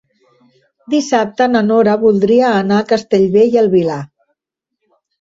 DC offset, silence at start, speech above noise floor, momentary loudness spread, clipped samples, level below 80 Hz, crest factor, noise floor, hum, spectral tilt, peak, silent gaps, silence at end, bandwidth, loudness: under 0.1%; 0.9 s; 66 dB; 7 LU; under 0.1%; -56 dBFS; 12 dB; -77 dBFS; none; -6 dB/octave; -2 dBFS; none; 1.15 s; 8 kHz; -13 LUFS